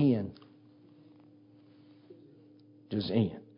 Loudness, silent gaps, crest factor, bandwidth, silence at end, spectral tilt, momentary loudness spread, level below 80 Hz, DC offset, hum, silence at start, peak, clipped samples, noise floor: -32 LUFS; none; 20 dB; 5.4 kHz; 0.2 s; -11 dB/octave; 27 LU; -64 dBFS; under 0.1%; none; 0 s; -16 dBFS; under 0.1%; -59 dBFS